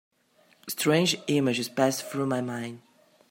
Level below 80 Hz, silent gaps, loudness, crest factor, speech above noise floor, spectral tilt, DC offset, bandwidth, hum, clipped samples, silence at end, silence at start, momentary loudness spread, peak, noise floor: -74 dBFS; none; -27 LUFS; 20 dB; 37 dB; -4.5 dB/octave; under 0.1%; 16.5 kHz; none; under 0.1%; 0.5 s; 0.65 s; 13 LU; -8 dBFS; -63 dBFS